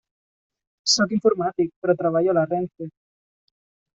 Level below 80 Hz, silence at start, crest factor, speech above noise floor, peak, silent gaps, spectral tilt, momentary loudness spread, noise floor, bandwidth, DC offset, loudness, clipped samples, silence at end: -66 dBFS; 0.85 s; 18 dB; over 69 dB; -6 dBFS; 1.76-1.82 s; -3.5 dB/octave; 12 LU; under -90 dBFS; 8 kHz; under 0.1%; -21 LUFS; under 0.1%; 1.05 s